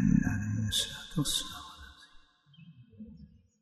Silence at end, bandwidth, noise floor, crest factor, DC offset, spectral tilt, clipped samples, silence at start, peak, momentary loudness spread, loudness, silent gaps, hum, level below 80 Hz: 0.35 s; 12.5 kHz; -59 dBFS; 20 dB; under 0.1%; -4 dB/octave; under 0.1%; 0 s; -14 dBFS; 22 LU; -31 LUFS; none; none; -48 dBFS